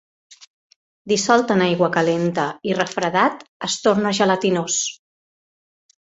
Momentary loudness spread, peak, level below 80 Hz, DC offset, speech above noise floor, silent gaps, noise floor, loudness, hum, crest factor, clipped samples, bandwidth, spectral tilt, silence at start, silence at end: 6 LU; -2 dBFS; -62 dBFS; under 0.1%; over 71 dB; 0.47-0.70 s, 0.76-1.05 s, 3.48-3.60 s; under -90 dBFS; -19 LUFS; none; 20 dB; under 0.1%; 8.2 kHz; -4 dB/octave; 0.3 s; 1.2 s